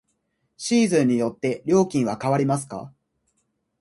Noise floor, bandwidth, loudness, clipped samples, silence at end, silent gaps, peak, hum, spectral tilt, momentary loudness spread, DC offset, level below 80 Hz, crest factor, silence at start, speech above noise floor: -73 dBFS; 11.5 kHz; -22 LUFS; under 0.1%; 0.9 s; none; -6 dBFS; none; -6 dB/octave; 11 LU; under 0.1%; -64 dBFS; 16 dB; 0.6 s; 51 dB